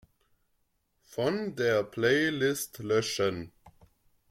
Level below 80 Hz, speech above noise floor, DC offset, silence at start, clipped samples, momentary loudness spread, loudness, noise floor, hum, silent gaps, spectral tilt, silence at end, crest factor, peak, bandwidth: -66 dBFS; 46 dB; under 0.1%; 1.1 s; under 0.1%; 12 LU; -29 LUFS; -75 dBFS; none; none; -4.5 dB/octave; 0.6 s; 20 dB; -12 dBFS; 16.5 kHz